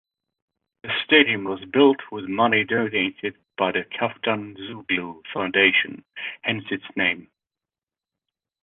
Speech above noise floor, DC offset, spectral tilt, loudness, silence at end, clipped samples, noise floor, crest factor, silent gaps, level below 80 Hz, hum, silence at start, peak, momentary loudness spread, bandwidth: over 67 dB; under 0.1%; -8 dB/octave; -22 LUFS; 1.4 s; under 0.1%; under -90 dBFS; 22 dB; none; -64 dBFS; none; 0.85 s; -2 dBFS; 15 LU; 4.2 kHz